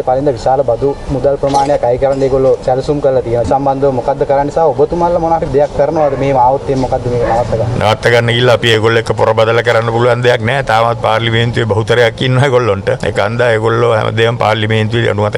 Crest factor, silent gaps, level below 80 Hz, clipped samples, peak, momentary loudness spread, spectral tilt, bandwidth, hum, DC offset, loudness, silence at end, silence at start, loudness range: 10 dB; none; -32 dBFS; under 0.1%; 0 dBFS; 4 LU; -6 dB/octave; 11.5 kHz; none; under 0.1%; -12 LUFS; 0 s; 0 s; 2 LU